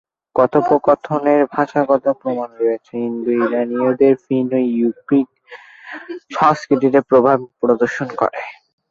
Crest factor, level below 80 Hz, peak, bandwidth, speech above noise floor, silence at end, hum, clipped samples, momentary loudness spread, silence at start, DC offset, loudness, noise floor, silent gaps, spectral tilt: 16 dB; -60 dBFS; -2 dBFS; 7.4 kHz; 25 dB; 0.4 s; none; under 0.1%; 13 LU; 0.35 s; under 0.1%; -17 LUFS; -41 dBFS; none; -7.5 dB/octave